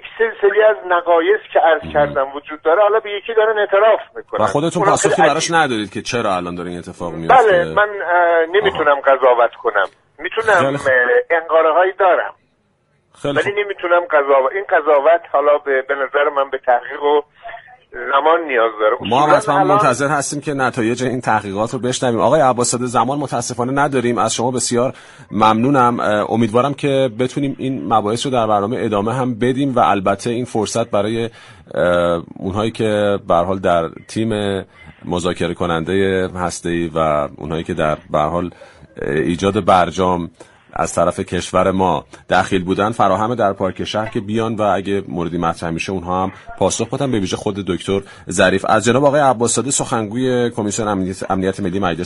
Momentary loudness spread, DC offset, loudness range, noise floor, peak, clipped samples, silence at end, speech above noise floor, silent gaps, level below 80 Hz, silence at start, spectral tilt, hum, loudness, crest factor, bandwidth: 9 LU; under 0.1%; 4 LU; -61 dBFS; 0 dBFS; under 0.1%; 0 s; 45 dB; none; -48 dBFS; 0.05 s; -4.5 dB/octave; none; -16 LUFS; 16 dB; 11.5 kHz